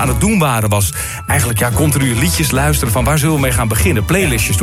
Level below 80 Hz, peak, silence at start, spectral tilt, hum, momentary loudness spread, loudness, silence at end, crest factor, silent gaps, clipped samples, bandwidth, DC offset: -24 dBFS; 0 dBFS; 0 s; -4.5 dB/octave; none; 2 LU; -14 LUFS; 0 s; 12 dB; none; under 0.1%; 16.5 kHz; under 0.1%